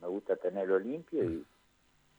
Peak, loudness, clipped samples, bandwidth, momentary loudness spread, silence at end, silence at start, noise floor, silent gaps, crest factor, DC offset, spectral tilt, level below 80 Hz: -16 dBFS; -34 LUFS; under 0.1%; over 20 kHz; 5 LU; 0.75 s; 0 s; -69 dBFS; none; 18 dB; under 0.1%; -8.5 dB/octave; -66 dBFS